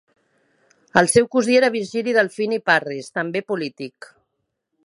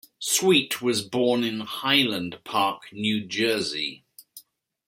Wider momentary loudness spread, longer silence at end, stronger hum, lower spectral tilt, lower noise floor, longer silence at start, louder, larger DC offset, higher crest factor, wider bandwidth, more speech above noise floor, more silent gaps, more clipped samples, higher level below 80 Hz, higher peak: first, 11 LU vs 8 LU; first, 0.95 s vs 0.45 s; neither; about the same, -4 dB/octave vs -3 dB/octave; first, -76 dBFS vs -53 dBFS; first, 0.95 s vs 0.2 s; first, -19 LUFS vs -24 LUFS; neither; about the same, 22 dB vs 20 dB; second, 11.5 kHz vs 16.5 kHz; first, 56 dB vs 29 dB; neither; neither; first, -60 dBFS vs -68 dBFS; first, 0 dBFS vs -4 dBFS